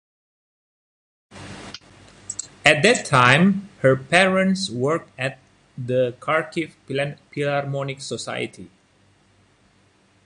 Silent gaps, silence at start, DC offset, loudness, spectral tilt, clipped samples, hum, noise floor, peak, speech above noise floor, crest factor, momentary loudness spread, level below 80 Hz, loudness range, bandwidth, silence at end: none; 1.35 s; under 0.1%; -20 LUFS; -4.5 dB/octave; under 0.1%; none; -59 dBFS; 0 dBFS; 38 dB; 22 dB; 20 LU; -60 dBFS; 10 LU; 11.5 kHz; 1.6 s